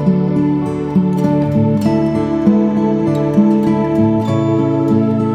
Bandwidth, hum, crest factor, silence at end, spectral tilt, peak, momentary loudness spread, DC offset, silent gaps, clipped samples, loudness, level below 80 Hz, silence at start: 9 kHz; none; 12 dB; 0 s; -9.5 dB/octave; 0 dBFS; 3 LU; under 0.1%; none; under 0.1%; -14 LUFS; -42 dBFS; 0 s